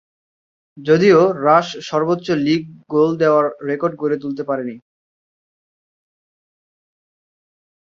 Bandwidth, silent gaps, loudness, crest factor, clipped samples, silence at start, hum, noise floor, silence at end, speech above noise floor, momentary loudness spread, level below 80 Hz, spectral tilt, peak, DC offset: 7.4 kHz; none; -17 LUFS; 18 dB; under 0.1%; 0.75 s; none; under -90 dBFS; 3.05 s; over 74 dB; 11 LU; -64 dBFS; -6.5 dB/octave; -2 dBFS; under 0.1%